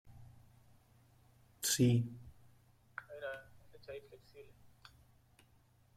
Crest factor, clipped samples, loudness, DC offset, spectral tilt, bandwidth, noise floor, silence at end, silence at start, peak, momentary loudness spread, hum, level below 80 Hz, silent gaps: 22 dB; under 0.1%; -36 LUFS; under 0.1%; -4.5 dB/octave; 16 kHz; -69 dBFS; 1.55 s; 0.05 s; -20 dBFS; 29 LU; none; -70 dBFS; none